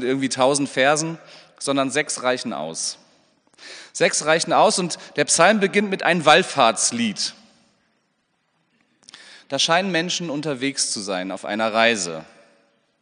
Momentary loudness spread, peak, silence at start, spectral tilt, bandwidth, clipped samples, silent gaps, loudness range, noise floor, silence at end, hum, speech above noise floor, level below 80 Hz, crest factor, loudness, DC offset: 13 LU; 0 dBFS; 0 s; -2.5 dB/octave; 10 kHz; under 0.1%; none; 7 LU; -69 dBFS; 0.8 s; none; 49 dB; -74 dBFS; 22 dB; -20 LUFS; under 0.1%